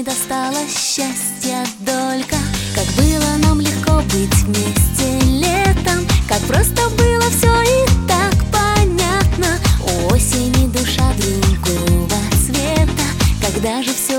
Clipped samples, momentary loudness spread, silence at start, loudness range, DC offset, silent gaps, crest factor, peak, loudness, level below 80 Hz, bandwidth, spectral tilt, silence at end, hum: under 0.1%; 5 LU; 0 s; 3 LU; under 0.1%; none; 14 dB; -2 dBFS; -15 LUFS; -22 dBFS; 17 kHz; -4.5 dB/octave; 0 s; none